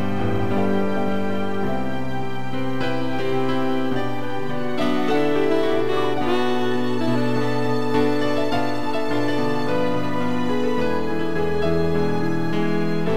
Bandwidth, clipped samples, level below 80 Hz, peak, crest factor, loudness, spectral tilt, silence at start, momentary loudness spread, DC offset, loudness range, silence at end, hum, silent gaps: 16 kHz; under 0.1%; -48 dBFS; -6 dBFS; 14 dB; -23 LUFS; -7 dB/octave; 0 s; 5 LU; 8%; 3 LU; 0 s; none; none